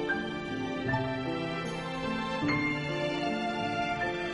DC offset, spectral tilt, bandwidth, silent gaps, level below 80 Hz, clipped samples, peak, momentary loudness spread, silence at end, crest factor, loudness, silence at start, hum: under 0.1%; -6 dB/octave; 11.5 kHz; none; -54 dBFS; under 0.1%; -16 dBFS; 5 LU; 0 s; 16 dB; -32 LUFS; 0 s; none